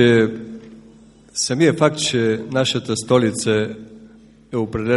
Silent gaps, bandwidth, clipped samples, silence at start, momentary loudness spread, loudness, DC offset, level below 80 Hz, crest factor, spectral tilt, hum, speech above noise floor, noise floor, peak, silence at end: none; 11.5 kHz; under 0.1%; 0 s; 15 LU; -19 LUFS; under 0.1%; -52 dBFS; 18 dB; -4.5 dB/octave; none; 29 dB; -46 dBFS; 0 dBFS; 0 s